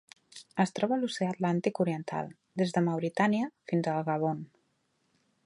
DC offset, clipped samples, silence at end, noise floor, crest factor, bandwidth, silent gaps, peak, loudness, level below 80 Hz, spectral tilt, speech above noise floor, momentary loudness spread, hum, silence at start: under 0.1%; under 0.1%; 1 s; -75 dBFS; 18 dB; 11.5 kHz; none; -12 dBFS; -31 LUFS; -76 dBFS; -6.5 dB/octave; 45 dB; 11 LU; none; 0.35 s